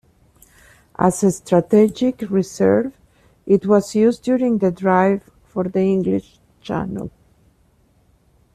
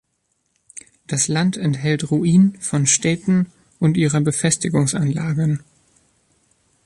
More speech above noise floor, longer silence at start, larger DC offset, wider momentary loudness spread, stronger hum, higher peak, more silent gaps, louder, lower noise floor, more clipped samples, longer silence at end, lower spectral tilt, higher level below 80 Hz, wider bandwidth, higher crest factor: second, 40 dB vs 52 dB; first, 1 s vs 0.75 s; neither; first, 14 LU vs 11 LU; neither; about the same, -2 dBFS vs -4 dBFS; neither; about the same, -18 LUFS vs -19 LUFS; second, -58 dBFS vs -70 dBFS; neither; first, 1.45 s vs 1.3 s; first, -7 dB/octave vs -5 dB/octave; about the same, -52 dBFS vs -54 dBFS; first, 13 kHz vs 11.5 kHz; about the same, 16 dB vs 16 dB